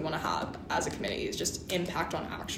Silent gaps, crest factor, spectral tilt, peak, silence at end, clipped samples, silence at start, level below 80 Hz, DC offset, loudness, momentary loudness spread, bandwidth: none; 18 dB; -3.5 dB/octave; -16 dBFS; 0 s; under 0.1%; 0 s; -54 dBFS; under 0.1%; -33 LUFS; 3 LU; 16 kHz